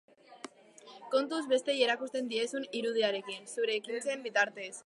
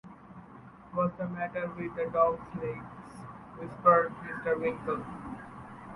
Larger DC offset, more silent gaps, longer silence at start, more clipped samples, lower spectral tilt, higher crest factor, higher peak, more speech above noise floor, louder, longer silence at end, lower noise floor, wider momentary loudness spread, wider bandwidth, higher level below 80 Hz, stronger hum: neither; neither; first, 0.3 s vs 0.05 s; neither; second, -2 dB/octave vs -8.5 dB/octave; about the same, 20 dB vs 22 dB; second, -14 dBFS vs -10 dBFS; about the same, 23 dB vs 21 dB; about the same, -32 LUFS vs -30 LUFS; about the same, 0.05 s vs 0 s; first, -56 dBFS vs -51 dBFS; second, 19 LU vs 22 LU; about the same, 11.5 kHz vs 11.5 kHz; second, under -90 dBFS vs -60 dBFS; neither